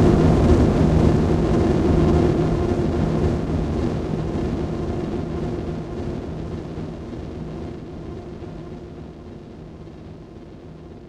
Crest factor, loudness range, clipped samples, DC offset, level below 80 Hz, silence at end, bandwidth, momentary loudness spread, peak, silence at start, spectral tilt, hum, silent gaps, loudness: 18 dB; 17 LU; under 0.1%; under 0.1%; -30 dBFS; 0 s; 9.8 kHz; 22 LU; -4 dBFS; 0 s; -8.5 dB/octave; none; none; -21 LUFS